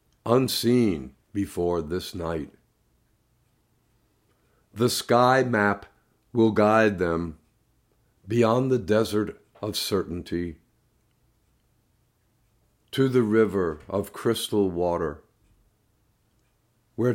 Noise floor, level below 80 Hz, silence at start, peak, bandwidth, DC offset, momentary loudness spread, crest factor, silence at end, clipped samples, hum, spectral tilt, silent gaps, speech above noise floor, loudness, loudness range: -68 dBFS; -58 dBFS; 0.25 s; -6 dBFS; 16 kHz; under 0.1%; 13 LU; 20 dB; 0 s; under 0.1%; none; -5.5 dB/octave; none; 44 dB; -25 LUFS; 10 LU